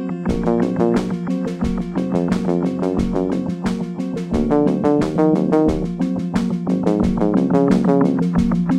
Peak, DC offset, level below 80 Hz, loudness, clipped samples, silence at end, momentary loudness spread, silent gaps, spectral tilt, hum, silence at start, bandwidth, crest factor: -2 dBFS; under 0.1%; -36 dBFS; -19 LUFS; under 0.1%; 0 s; 7 LU; none; -8.5 dB/octave; none; 0 s; 10.5 kHz; 16 dB